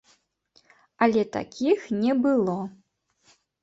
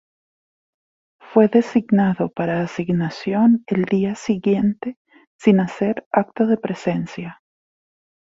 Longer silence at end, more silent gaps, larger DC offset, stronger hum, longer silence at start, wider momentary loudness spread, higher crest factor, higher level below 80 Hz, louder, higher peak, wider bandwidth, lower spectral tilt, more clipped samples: second, 0.9 s vs 1.05 s; second, none vs 4.97-5.05 s, 5.27-5.39 s, 6.06-6.11 s; neither; neither; second, 1 s vs 1.3 s; about the same, 8 LU vs 8 LU; about the same, 22 dB vs 18 dB; second, -68 dBFS vs -58 dBFS; second, -24 LUFS vs -19 LUFS; second, -6 dBFS vs -2 dBFS; about the same, 7.8 kHz vs 7.8 kHz; second, -6.5 dB/octave vs -8 dB/octave; neither